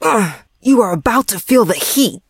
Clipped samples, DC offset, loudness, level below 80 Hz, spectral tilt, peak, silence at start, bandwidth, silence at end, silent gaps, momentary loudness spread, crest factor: under 0.1%; under 0.1%; -14 LUFS; -44 dBFS; -4 dB/octave; 0 dBFS; 0 s; 16.5 kHz; 0.1 s; none; 5 LU; 14 dB